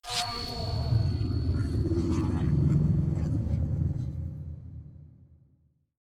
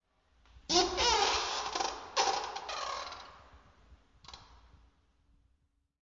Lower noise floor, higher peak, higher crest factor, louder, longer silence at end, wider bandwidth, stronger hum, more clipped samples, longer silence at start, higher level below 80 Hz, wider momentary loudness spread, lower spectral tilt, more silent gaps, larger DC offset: second, -67 dBFS vs -75 dBFS; about the same, -14 dBFS vs -14 dBFS; second, 16 dB vs 24 dB; about the same, -29 LUFS vs -31 LUFS; second, 0.95 s vs 1.45 s; first, 13.5 kHz vs 7.6 kHz; neither; neither; second, 0.05 s vs 0.55 s; first, -38 dBFS vs -56 dBFS; second, 16 LU vs 25 LU; first, -6.5 dB/octave vs -1 dB/octave; neither; neither